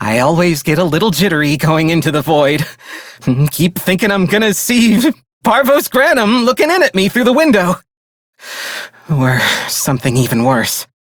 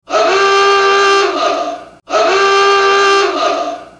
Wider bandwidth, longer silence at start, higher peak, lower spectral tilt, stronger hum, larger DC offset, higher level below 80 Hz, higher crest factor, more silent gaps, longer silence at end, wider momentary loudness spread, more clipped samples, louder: first, over 20 kHz vs 10 kHz; about the same, 0 s vs 0.1 s; about the same, 0 dBFS vs 0 dBFS; first, -5 dB/octave vs -1 dB/octave; neither; neither; first, -44 dBFS vs -54 dBFS; about the same, 12 dB vs 10 dB; first, 5.33-5.41 s, 7.97-8.33 s vs none; first, 0.3 s vs 0.15 s; about the same, 11 LU vs 9 LU; neither; about the same, -12 LUFS vs -11 LUFS